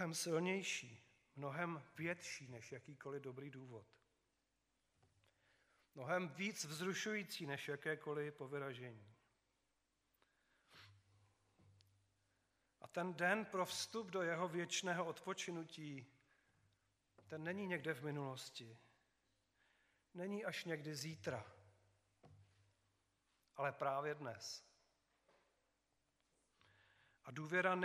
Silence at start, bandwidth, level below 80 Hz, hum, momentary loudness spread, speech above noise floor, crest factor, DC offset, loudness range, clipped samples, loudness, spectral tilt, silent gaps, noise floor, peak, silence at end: 0 s; 15 kHz; under -90 dBFS; none; 16 LU; 41 dB; 26 dB; under 0.1%; 12 LU; under 0.1%; -45 LUFS; -4 dB/octave; none; -86 dBFS; -22 dBFS; 0 s